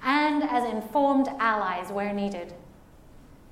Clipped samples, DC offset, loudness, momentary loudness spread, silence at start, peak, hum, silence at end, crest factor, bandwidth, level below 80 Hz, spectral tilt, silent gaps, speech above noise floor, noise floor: under 0.1%; under 0.1%; -26 LUFS; 9 LU; 0 s; -10 dBFS; none; 0.15 s; 18 dB; 15.5 kHz; -56 dBFS; -5.5 dB/octave; none; 24 dB; -51 dBFS